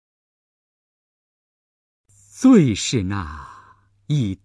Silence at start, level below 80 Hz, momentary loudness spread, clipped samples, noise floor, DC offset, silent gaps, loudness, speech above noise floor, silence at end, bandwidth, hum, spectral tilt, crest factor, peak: 2.35 s; -48 dBFS; 18 LU; under 0.1%; -53 dBFS; under 0.1%; none; -18 LUFS; 35 dB; 0.1 s; 11 kHz; none; -6 dB/octave; 20 dB; -4 dBFS